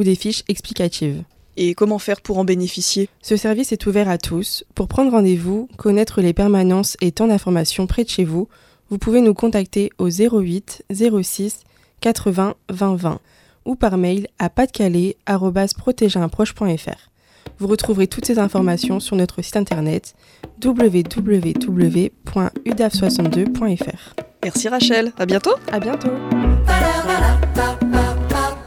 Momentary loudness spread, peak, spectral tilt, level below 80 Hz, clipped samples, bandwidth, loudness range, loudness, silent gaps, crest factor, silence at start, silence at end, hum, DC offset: 8 LU; -2 dBFS; -5.5 dB/octave; -30 dBFS; under 0.1%; 16.5 kHz; 3 LU; -18 LUFS; none; 16 dB; 0 s; 0 s; none; under 0.1%